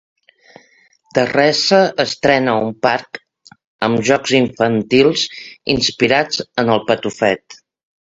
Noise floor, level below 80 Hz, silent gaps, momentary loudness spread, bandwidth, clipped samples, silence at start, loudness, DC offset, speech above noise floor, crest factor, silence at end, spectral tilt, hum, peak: -54 dBFS; -52 dBFS; 3.64-3.79 s; 9 LU; 8 kHz; under 0.1%; 1.15 s; -15 LUFS; under 0.1%; 38 dB; 16 dB; 0.5 s; -4 dB/octave; none; 0 dBFS